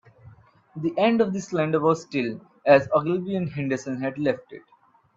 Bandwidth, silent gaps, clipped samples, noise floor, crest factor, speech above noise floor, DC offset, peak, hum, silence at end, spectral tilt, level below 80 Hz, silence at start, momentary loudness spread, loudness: 7.8 kHz; none; under 0.1%; -51 dBFS; 20 dB; 28 dB; under 0.1%; -4 dBFS; none; 0.6 s; -6.5 dB/octave; -66 dBFS; 0.25 s; 11 LU; -24 LUFS